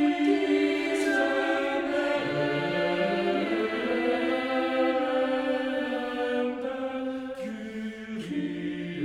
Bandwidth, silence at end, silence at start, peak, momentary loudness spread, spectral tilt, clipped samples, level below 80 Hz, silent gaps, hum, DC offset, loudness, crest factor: 12 kHz; 0 s; 0 s; -12 dBFS; 9 LU; -5.5 dB/octave; under 0.1%; -64 dBFS; none; none; under 0.1%; -28 LUFS; 14 dB